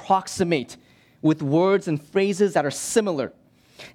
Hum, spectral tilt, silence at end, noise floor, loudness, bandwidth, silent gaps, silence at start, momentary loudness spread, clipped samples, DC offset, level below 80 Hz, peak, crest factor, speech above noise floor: none; -5 dB/octave; 0.05 s; -47 dBFS; -23 LUFS; 16 kHz; none; 0 s; 7 LU; under 0.1%; under 0.1%; -64 dBFS; -6 dBFS; 18 dB; 25 dB